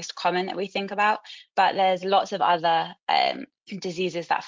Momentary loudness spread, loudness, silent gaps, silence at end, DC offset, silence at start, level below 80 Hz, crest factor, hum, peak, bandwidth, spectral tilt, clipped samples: 10 LU; -24 LUFS; 3.03-3.07 s; 0 s; under 0.1%; 0 s; -76 dBFS; 16 dB; none; -8 dBFS; 7.6 kHz; -4 dB/octave; under 0.1%